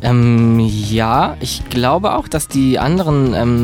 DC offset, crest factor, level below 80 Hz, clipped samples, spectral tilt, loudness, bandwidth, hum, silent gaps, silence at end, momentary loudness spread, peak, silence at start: under 0.1%; 12 dB; -32 dBFS; under 0.1%; -6.5 dB/octave; -14 LUFS; 16.5 kHz; none; none; 0 s; 7 LU; -2 dBFS; 0 s